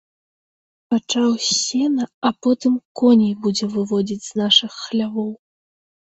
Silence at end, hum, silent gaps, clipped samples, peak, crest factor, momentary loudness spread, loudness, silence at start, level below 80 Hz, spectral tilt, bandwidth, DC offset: 0.75 s; none; 2.14-2.22 s, 2.85-2.95 s; under 0.1%; -2 dBFS; 18 dB; 9 LU; -19 LUFS; 0.9 s; -64 dBFS; -4 dB/octave; 8.2 kHz; under 0.1%